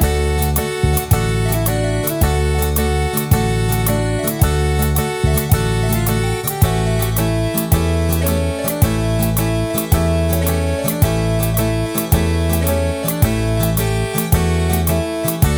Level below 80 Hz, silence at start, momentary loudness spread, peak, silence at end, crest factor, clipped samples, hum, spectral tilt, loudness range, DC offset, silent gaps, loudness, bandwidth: -24 dBFS; 0 s; 2 LU; -2 dBFS; 0 s; 14 dB; under 0.1%; none; -5.5 dB/octave; 0 LU; under 0.1%; none; -17 LUFS; over 20 kHz